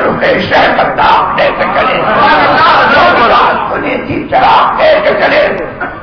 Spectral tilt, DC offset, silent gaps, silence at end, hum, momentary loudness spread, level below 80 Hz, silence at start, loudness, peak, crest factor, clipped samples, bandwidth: -6 dB/octave; under 0.1%; none; 0 s; none; 7 LU; -34 dBFS; 0 s; -8 LUFS; 0 dBFS; 8 dB; under 0.1%; 6.4 kHz